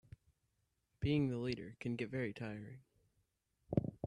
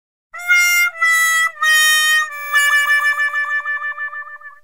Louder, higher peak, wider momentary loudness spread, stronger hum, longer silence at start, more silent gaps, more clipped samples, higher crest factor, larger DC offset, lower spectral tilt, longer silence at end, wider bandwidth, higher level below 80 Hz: second, -41 LUFS vs -13 LUFS; second, -18 dBFS vs -2 dBFS; about the same, 14 LU vs 14 LU; neither; first, 1 s vs 0.35 s; neither; neither; first, 24 dB vs 14 dB; second, under 0.1% vs 0.4%; first, -8 dB/octave vs 6 dB/octave; about the same, 0 s vs 0.1 s; second, 10.5 kHz vs 16.5 kHz; first, -64 dBFS vs -70 dBFS